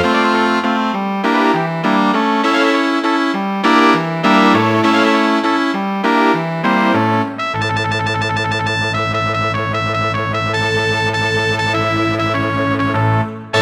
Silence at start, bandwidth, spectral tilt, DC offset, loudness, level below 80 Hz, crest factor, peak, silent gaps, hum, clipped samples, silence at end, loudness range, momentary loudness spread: 0 s; 16 kHz; -5.5 dB/octave; under 0.1%; -15 LUFS; -46 dBFS; 14 dB; 0 dBFS; none; none; under 0.1%; 0 s; 4 LU; 5 LU